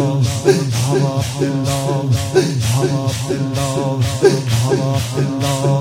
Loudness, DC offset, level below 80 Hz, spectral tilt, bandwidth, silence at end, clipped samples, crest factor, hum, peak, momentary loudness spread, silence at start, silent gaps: -17 LUFS; under 0.1%; -42 dBFS; -5.5 dB/octave; 16.5 kHz; 0 s; under 0.1%; 16 dB; none; 0 dBFS; 4 LU; 0 s; none